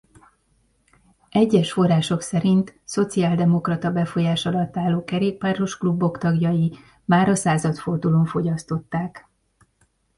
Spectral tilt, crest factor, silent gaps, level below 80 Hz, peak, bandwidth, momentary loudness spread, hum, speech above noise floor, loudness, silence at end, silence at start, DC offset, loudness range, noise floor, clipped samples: -6.5 dB/octave; 16 dB; none; -54 dBFS; -6 dBFS; 11.5 kHz; 7 LU; none; 45 dB; -21 LUFS; 1 s; 1.35 s; under 0.1%; 2 LU; -65 dBFS; under 0.1%